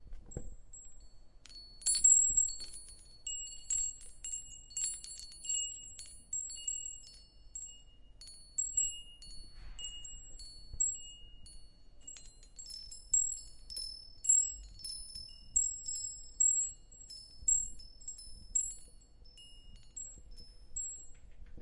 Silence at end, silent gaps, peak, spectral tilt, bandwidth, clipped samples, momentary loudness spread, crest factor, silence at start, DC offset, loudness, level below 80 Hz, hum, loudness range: 0 s; none; -14 dBFS; 1 dB/octave; 11.5 kHz; under 0.1%; 24 LU; 24 dB; 0 s; under 0.1%; -33 LUFS; -54 dBFS; none; 11 LU